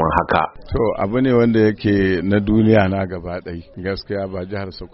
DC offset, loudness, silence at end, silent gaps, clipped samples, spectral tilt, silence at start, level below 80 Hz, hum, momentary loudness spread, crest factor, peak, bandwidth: under 0.1%; -18 LUFS; 0.05 s; none; under 0.1%; -6.5 dB/octave; 0 s; -38 dBFS; none; 14 LU; 18 dB; 0 dBFS; 5.8 kHz